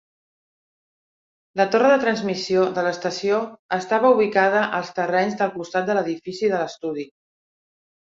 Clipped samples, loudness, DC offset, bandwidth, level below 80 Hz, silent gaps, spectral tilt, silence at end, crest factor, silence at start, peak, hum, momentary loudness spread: under 0.1%; -21 LUFS; under 0.1%; 7.8 kHz; -68 dBFS; 3.59-3.69 s; -5 dB/octave; 1.05 s; 18 dB; 1.55 s; -4 dBFS; none; 11 LU